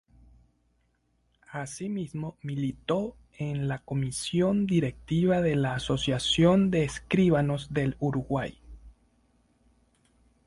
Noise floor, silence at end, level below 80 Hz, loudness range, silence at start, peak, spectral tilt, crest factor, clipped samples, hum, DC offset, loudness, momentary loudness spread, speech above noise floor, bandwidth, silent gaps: -71 dBFS; 1.55 s; -52 dBFS; 9 LU; 1.5 s; -10 dBFS; -6 dB/octave; 18 dB; under 0.1%; none; under 0.1%; -28 LUFS; 13 LU; 44 dB; 11.5 kHz; none